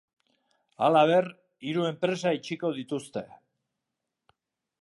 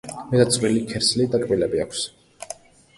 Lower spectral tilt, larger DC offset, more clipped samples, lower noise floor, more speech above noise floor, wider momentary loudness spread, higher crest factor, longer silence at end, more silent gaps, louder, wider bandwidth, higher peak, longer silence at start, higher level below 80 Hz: first, -6 dB/octave vs -4.5 dB/octave; neither; neither; first, -85 dBFS vs -41 dBFS; first, 59 dB vs 21 dB; about the same, 17 LU vs 18 LU; about the same, 22 dB vs 20 dB; first, 1.55 s vs 0.45 s; neither; second, -27 LUFS vs -21 LUFS; about the same, 11.5 kHz vs 11.5 kHz; second, -8 dBFS vs -4 dBFS; first, 0.8 s vs 0.05 s; second, -78 dBFS vs -52 dBFS